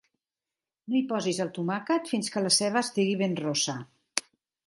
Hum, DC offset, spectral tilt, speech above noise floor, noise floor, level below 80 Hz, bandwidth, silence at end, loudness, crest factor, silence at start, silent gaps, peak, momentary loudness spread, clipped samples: none; under 0.1%; -3.5 dB/octave; over 62 dB; under -90 dBFS; -76 dBFS; 11.5 kHz; 0.45 s; -28 LUFS; 26 dB; 0.85 s; none; -4 dBFS; 9 LU; under 0.1%